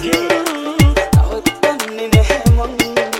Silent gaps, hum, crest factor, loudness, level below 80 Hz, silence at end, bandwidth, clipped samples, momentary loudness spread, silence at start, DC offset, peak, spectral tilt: none; none; 14 dB; -15 LUFS; -20 dBFS; 0 s; 17 kHz; under 0.1%; 5 LU; 0 s; under 0.1%; 0 dBFS; -5.5 dB/octave